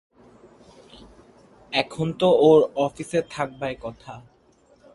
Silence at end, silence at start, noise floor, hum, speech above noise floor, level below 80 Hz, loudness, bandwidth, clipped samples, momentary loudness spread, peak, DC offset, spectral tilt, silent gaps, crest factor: 0.75 s; 1.7 s; -58 dBFS; none; 36 dB; -58 dBFS; -22 LUFS; 11.5 kHz; under 0.1%; 22 LU; -4 dBFS; under 0.1%; -6 dB/octave; none; 20 dB